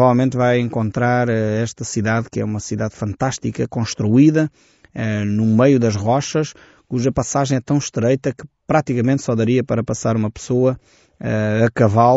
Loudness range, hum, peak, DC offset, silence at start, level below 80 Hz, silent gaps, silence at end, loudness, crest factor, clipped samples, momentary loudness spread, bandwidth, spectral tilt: 2 LU; none; -2 dBFS; under 0.1%; 0 s; -48 dBFS; none; 0 s; -18 LUFS; 16 dB; under 0.1%; 9 LU; 8 kHz; -7 dB/octave